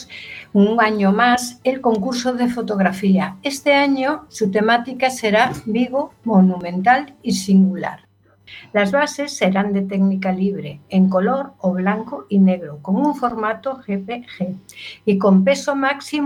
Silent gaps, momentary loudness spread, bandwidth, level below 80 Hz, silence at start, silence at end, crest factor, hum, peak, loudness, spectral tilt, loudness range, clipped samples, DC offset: none; 10 LU; 13 kHz; -58 dBFS; 0 s; 0 s; 18 dB; none; 0 dBFS; -18 LUFS; -6 dB/octave; 3 LU; under 0.1%; under 0.1%